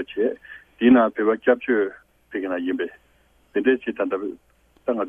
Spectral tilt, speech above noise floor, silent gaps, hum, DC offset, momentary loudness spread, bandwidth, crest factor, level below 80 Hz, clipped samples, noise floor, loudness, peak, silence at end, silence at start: -7.5 dB/octave; 38 dB; none; none; under 0.1%; 15 LU; 3.6 kHz; 20 dB; -62 dBFS; under 0.1%; -60 dBFS; -22 LUFS; -4 dBFS; 0 s; 0 s